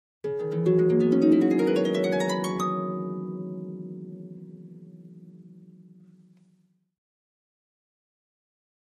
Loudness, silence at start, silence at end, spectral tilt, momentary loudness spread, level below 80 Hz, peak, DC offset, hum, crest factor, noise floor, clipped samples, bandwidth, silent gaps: -25 LUFS; 0.25 s; 3.05 s; -7 dB/octave; 24 LU; -72 dBFS; -10 dBFS; under 0.1%; none; 18 dB; -66 dBFS; under 0.1%; 15 kHz; none